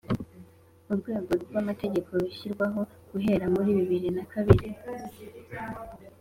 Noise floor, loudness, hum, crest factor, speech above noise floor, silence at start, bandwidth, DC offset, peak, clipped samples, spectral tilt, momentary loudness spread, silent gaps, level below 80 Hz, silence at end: -53 dBFS; -29 LUFS; none; 26 dB; 25 dB; 0.1 s; 16 kHz; under 0.1%; -2 dBFS; under 0.1%; -8.5 dB/octave; 18 LU; none; -48 dBFS; 0.1 s